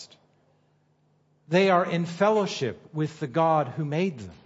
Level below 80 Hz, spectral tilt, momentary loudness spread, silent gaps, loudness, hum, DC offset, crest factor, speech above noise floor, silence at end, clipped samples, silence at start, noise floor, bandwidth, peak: -70 dBFS; -6.5 dB/octave; 10 LU; none; -25 LUFS; 50 Hz at -50 dBFS; under 0.1%; 18 dB; 41 dB; 0.1 s; under 0.1%; 0 s; -66 dBFS; 8 kHz; -8 dBFS